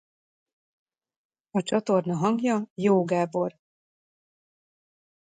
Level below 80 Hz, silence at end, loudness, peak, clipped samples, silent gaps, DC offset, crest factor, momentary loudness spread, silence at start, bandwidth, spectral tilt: -74 dBFS; 1.7 s; -26 LUFS; -10 dBFS; under 0.1%; 2.70-2.76 s; under 0.1%; 18 dB; 7 LU; 1.55 s; 9.4 kHz; -7 dB/octave